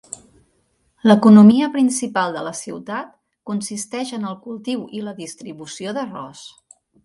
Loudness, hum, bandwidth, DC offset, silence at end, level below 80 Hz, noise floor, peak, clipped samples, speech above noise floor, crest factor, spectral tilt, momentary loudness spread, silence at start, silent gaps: -17 LUFS; none; 11.5 kHz; under 0.1%; 0.55 s; -64 dBFS; -64 dBFS; 0 dBFS; under 0.1%; 47 dB; 18 dB; -5.5 dB/octave; 23 LU; 1.05 s; none